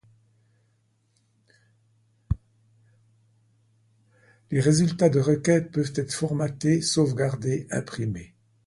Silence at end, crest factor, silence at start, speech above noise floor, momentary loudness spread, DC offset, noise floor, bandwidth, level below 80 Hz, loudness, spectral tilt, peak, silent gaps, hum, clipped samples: 0.4 s; 20 dB; 2.3 s; 45 dB; 12 LU; under 0.1%; -68 dBFS; 11.5 kHz; -48 dBFS; -25 LUFS; -6 dB/octave; -6 dBFS; none; none; under 0.1%